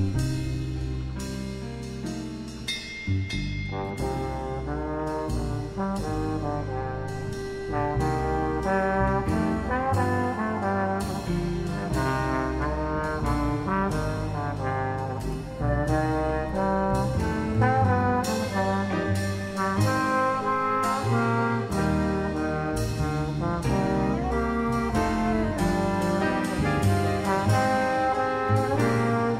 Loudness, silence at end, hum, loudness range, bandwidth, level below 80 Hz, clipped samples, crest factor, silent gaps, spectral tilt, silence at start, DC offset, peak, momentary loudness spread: -27 LUFS; 0 s; none; 6 LU; 16 kHz; -38 dBFS; under 0.1%; 16 dB; none; -6.5 dB/octave; 0 s; under 0.1%; -10 dBFS; 8 LU